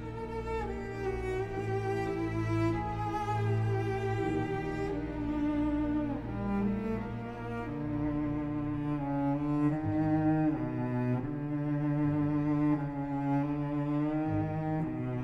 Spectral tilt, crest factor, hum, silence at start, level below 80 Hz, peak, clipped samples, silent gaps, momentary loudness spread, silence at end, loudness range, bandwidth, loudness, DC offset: -9 dB/octave; 12 dB; none; 0 s; -48 dBFS; -18 dBFS; under 0.1%; none; 6 LU; 0 s; 3 LU; 8.4 kHz; -33 LUFS; under 0.1%